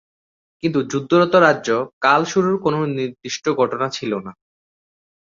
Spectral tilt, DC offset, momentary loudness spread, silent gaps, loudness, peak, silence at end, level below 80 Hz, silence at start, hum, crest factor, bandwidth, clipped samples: -5.5 dB/octave; under 0.1%; 11 LU; 1.93-2.01 s; -19 LUFS; -2 dBFS; 0.95 s; -60 dBFS; 0.65 s; none; 18 dB; 7.6 kHz; under 0.1%